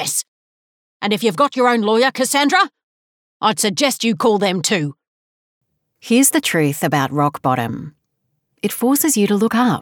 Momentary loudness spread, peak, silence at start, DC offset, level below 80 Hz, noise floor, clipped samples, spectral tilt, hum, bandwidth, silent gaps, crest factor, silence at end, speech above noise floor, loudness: 8 LU; -4 dBFS; 0 s; under 0.1%; -64 dBFS; -71 dBFS; under 0.1%; -3.5 dB/octave; none; over 20 kHz; 0.28-1.00 s, 2.83-3.40 s, 5.08-5.61 s; 14 dB; 0 s; 55 dB; -17 LUFS